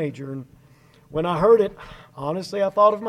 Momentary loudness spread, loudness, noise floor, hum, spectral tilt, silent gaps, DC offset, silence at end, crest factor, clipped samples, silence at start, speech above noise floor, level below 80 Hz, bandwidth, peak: 19 LU; -21 LUFS; -53 dBFS; none; -7 dB/octave; none; under 0.1%; 0 s; 18 dB; under 0.1%; 0 s; 32 dB; -52 dBFS; 11.5 kHz; -4 dBFS